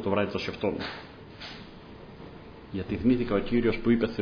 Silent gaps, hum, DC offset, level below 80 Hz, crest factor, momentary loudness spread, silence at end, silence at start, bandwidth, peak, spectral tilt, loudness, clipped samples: none; none; under 0.1%; -46 dBFS; 18 dB; 21 LU; 0 s; 0 s; 5.4 kHz; -12 dBFS; -7.5 dB/octave; -28 LUFS; under 0.1%